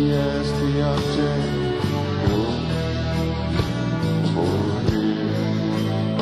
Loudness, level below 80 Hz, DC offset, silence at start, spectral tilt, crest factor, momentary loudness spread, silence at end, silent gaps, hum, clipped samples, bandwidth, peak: -22 LUFS; -36 dBFS; under 0.1%; 0 s; -7 dB/octave; 14 dB; 2 LU; 0 s; none; none; under 0.1%; 13 kHz; -6 dBFS